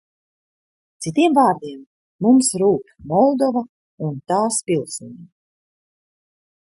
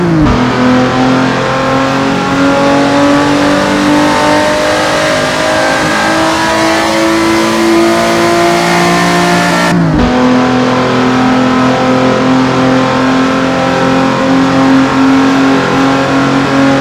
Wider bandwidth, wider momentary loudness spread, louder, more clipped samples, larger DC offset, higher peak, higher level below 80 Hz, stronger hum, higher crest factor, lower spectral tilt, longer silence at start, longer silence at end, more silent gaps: second, 11.5 kHz vs 15 kHz; first, 16 LU vs 2 LU; second, -18 LUFS vs -9 LUFS; second, under 0.1% vs 0.7%; neither; second, -4 dBFS vs 0 dBFS; second, -64 dBFS vs -32 dBFS; neither; first, 18 dB vs 8 dB; about the same, -5 dB/octave vs -5 dB/octave; first, 1 s vs 0 s; first, 1.4 s vs 0 s; first, 1.86-2.19 s, 3.69-3.98 s vs none